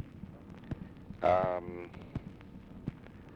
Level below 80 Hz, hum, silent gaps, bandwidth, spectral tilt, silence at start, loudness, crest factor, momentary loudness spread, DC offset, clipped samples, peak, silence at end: -56 dBFS; none; none; 7.6 kHz; -8.5 dB/octave; 0 s; -36 LUFS; 20 dB; 21 LU; under 0.1%; under 0.1%; -18 dBFS; 0 s